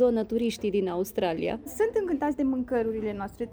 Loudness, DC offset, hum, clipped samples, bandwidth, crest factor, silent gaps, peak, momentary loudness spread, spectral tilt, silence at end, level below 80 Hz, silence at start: -28 LUFS; under 0.1%; none; under 0.1%; over 20 kHz; 14 dB; none; -12 dBFS; 5 LU; -6 dB/octave; 0 s; -54 dBFS; 0 s